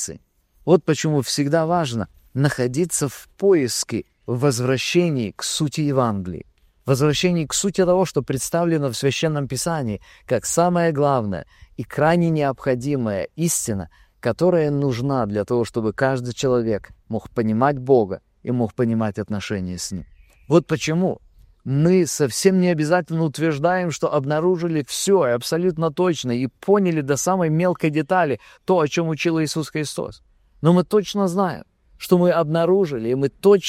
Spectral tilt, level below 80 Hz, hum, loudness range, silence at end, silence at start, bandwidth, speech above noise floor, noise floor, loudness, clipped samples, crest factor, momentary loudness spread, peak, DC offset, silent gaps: -5.5 dB/octave; -52 dBFS; none; 2 LU; 0 s; 0 s; 16 kHz; 36 dB; -56 dBFS; -21 LUFS; under 0.1%; 18 dB; 10 LU; -2 dBFS; under 0.1%; none